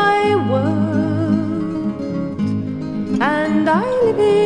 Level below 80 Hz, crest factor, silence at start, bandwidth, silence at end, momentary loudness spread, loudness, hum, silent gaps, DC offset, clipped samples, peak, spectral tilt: -50 dBFS; 14 dB; 0 s; 11 kHz; 0 s; 8 LU; -18 LUFS; none; none; under 0.1%; under 0.1%; -2 dBFS; -7.5 dB/octave